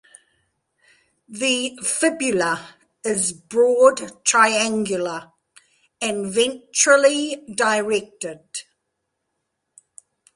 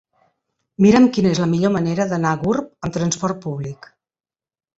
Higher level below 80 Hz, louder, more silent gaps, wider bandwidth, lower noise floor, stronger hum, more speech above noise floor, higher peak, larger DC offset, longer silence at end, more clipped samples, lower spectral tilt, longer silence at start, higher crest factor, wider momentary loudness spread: second, -66 dBFS vs -52 dBFS; about the same, -19 LUFS vs -18 LUFS; neither; first, 11.5 kHz vs 8 kHz; second, -77 dBFS vs under -90 dBFS; neither; second, 57 dB vs over 72 dB; about the same, -2 dBFS vs -2 dBFS; neither; first, 1.75 s vs 1.05 s; neither; second, -2 dB/octave vs -6 dB/octave; first, 1.3 s vs 0.8 s; about the same, 20 dB vs 18 dB; about the same, 16 LU vs 14 LU